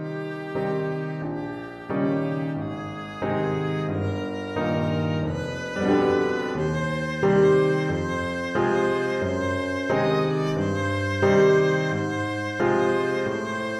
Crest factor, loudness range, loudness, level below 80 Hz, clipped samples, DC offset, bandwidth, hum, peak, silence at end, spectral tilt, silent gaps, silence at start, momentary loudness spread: 16 dB; 5 LU; -24 LUFS; -52 dBFS; under 0.1%; under 0.1%; 11 kHz; none; -8 dBFS; 0 s; -7 dB/octave; none; 0 s; 11 LU